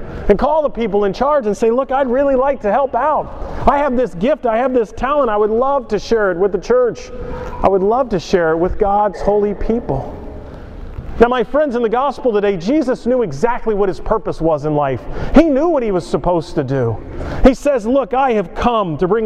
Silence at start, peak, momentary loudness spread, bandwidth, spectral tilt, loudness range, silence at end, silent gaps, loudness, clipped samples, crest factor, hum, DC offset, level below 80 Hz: 0 s; 0 dBFS; 8 LU; 10 kHz; -7 dB/octave; 2 LU; 0 s; none; -16 LUFS; under 0.1%; 16 dB; none; under 0.1%; -28 dBFS